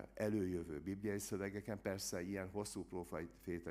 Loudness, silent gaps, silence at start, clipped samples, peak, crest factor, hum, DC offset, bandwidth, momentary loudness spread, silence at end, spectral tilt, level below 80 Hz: -44 LUFS; none; 0 s; under 0.1%; -26 dBFS; 18 dB; none; under 0.1%; 15.5 kHz; 7 LU; 0 s; -5 dB/octave; -66 dBFS